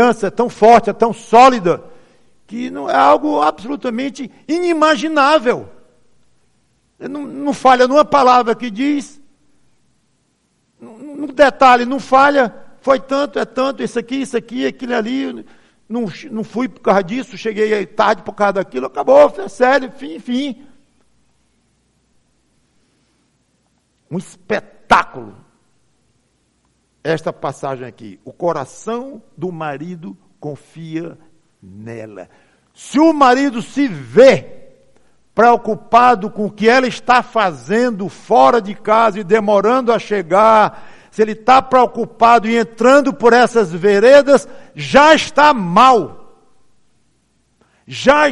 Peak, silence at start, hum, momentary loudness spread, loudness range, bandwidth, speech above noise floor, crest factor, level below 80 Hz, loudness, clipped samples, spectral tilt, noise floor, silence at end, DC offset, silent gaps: 0 dBFS; 0 s; none; 18 LU; 14 LU; 11.5 kHz; 49 dB; 16 dB; -52 dBFS; -13 LUFS; under 0.1%; -5 dB/octave; -62 dBFS; 0 s; under 0.1%; none